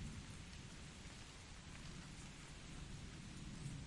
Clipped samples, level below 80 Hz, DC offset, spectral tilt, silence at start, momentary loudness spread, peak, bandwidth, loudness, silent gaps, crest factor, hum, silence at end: under 0.1%; -60 dBFS; under 0.1%; -4 dB/octave; 0 s; 3 LU; -36 dBFS; 11.5 kHz; -54 LUFS; none; 16 dB; none; 0 s